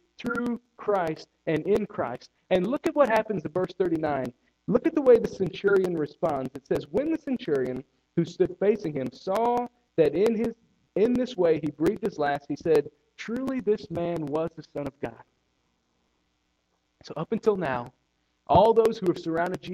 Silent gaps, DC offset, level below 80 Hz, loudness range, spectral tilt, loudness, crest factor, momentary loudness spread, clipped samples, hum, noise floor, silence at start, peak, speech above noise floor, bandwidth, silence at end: none; under 0.1%; -58 dBFS; 8 LU; -7 dB/octave; -26 LUFS; 20 dB; 12 LU; under 0.1%; none; -74 dBFS; 0.2 s; -6 dBFS; 48 dB; 14 kHz; 0 s